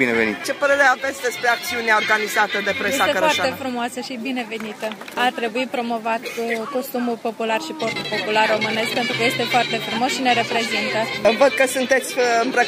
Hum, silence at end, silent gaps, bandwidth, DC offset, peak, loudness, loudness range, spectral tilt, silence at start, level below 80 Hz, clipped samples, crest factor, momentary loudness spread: none; 0 s; none; 15.5 kHz; under 0.1%; -2 dBFS; -20 LUFS; 5 LU; -3 dB/octave; 0 s; -64 dBFS; under 0.1%; 18 dB; 9 LU